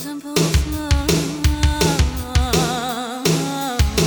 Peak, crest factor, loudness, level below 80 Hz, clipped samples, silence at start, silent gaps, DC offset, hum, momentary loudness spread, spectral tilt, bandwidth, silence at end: -4 dBFS; 16 dB; -19 LUFS; -24 dBFS; under 0.1%; 0 s; none; under 0.1%; none; 4 LU; -4.5 dB/octave; over 20 kHz; 0 s